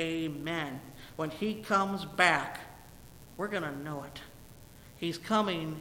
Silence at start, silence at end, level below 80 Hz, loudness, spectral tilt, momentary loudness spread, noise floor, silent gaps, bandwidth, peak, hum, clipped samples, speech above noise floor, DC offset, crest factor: 0 s; 0 s; -60 dBFS; -32 LUFS; -4.5 dB/octave; 22 LU; -53 dBFS; none; 17 kHz; -8 dBFS; none; under 0.1%; 20 dB; under 0.1%; 26 dB